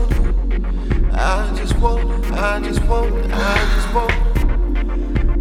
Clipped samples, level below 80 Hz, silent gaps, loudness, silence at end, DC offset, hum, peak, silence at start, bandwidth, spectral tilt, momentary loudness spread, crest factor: under 0.1%; -16 dBFS; none; -20 LUFS; 0 s; under 0.1%; none; 0 dBFS; 0 s; 11 kHz; -6 dB/octave; 4 LU; 16 dB